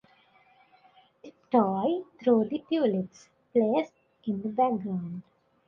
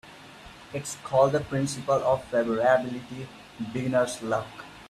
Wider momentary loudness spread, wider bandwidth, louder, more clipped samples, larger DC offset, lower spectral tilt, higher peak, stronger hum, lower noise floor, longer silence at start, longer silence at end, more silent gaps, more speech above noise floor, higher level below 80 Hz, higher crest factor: second, 14 LU vs 19 LU; second, 7 kHz vs 14.5 kHz; about the same, -28 LUFS vs -26 LUFS; neither; neither; first, -8.5 dB/octave vs -5.5 dB/octave; about the same, -10 dBFS vs -8 dBFS; neither; first, -62 dBFS vs -47 dBFS; first, 1.25 s vs 0.05 s; first, 0.45 s vs 0 s; neither; first, 35 dB vs 21 dB; second, -72 dBFS vs -58 dBFS; about the same, 20 dB vs 20 dB